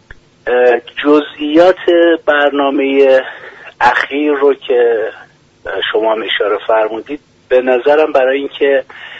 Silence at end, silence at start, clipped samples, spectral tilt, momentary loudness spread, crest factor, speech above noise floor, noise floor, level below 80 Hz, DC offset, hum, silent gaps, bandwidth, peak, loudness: 0 s; 0.45 s; under 0.1%; -5 dB/octave; 14 LU; 12 dB; 22 dB; -33 dBFS; -52 dBFS; under 0.1%; none; none; 7.8 kHz; 0 dBFS; -12 LUFS